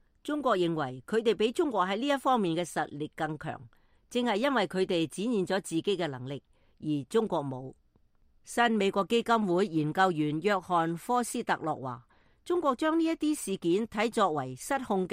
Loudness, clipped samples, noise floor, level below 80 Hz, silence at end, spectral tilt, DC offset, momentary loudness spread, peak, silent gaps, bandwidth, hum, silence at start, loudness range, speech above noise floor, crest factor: -30 LUFS; under 0.1%; -65 dBFS; -66 dBFS; 0 s; -5 dB/octave; under 0.1%; 9 LU; -12 dBFS; none; 15.5 kHz; none; 0.25 s; 4 LU; 36 dB; 18 dB